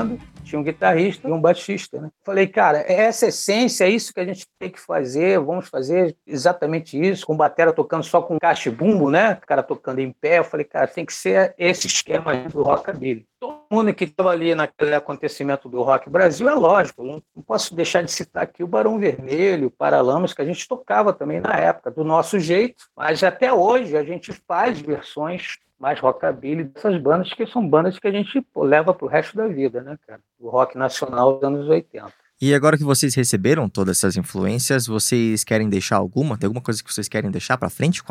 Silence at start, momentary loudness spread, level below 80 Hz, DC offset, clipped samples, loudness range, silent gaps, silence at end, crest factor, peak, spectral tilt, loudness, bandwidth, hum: 0 s; 10 LU; -60 dBFS; under 0.1%; under 0.1%; 3 LU; none; 0.1 s; 18 dB; -2 dBFS; -4.5 dB/octave; -20 LUFS; 16 kHz; none